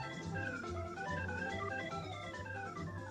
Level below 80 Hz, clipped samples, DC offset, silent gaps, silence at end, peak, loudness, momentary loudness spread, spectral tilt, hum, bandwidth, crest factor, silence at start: -60 dBFS; under 0.1%; under 0.1%; none; 0 s; -28 dBFS; -42 LUFS; 5 LU; -5.5 dB/octave; none; 11.5 kHz; 16 dB; 0 s